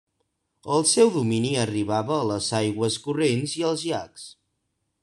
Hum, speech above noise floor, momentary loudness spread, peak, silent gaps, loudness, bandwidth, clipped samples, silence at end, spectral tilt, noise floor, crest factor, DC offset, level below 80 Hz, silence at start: none; 53 dB; 13 LU; -6 dBFS; none; -23 LUFS; 12.5 kHz; under 0.1%; 0.7 s; -4.5 dB/octave; -76 dBFS; 20 dB; under 0.1%; -64 dBFS; 0.65 s